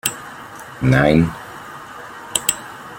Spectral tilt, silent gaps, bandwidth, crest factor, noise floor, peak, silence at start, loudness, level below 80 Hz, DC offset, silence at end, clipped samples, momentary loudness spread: -4.5 dB/octave; none; 17 kHz; 20 dB; -36 dBFS; 0 dBFS; 0.05 s; -17 LUFS; -42 dBFS; under 0.1%; 0 s; under 0.1%; 20 LU